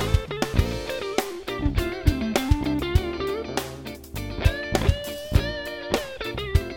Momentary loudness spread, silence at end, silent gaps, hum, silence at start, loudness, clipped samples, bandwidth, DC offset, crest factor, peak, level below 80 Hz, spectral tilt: 7 LU; 0 s; none; none; 0 s; -26 LUFS; under 0.1%; 17 kHz; under 0.1%; 20 dB; -4 dBFS; -30 dBFS; -5.5 dB/octave